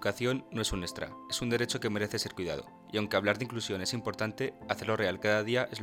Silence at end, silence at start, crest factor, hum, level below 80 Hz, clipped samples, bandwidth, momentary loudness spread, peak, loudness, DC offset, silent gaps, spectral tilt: 0 s; 0 s; 22 dB; none; -54 dBFS; under 0.1%; 17 kHz; 8 LU; -10 dBFS; -33 LUFS; under 0.1%; none; -4 dB/octave